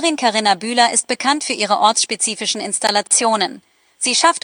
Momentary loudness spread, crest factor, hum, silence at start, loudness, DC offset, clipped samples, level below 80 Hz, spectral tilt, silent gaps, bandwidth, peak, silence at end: 5 LU; 18 dB; none; 0 s; -16 LUFS; under 0.1%; under 0.1%; -72 dBFS; -0.5 dB/octave; none; over 20 kHz; 0 dBFS; 0.05 s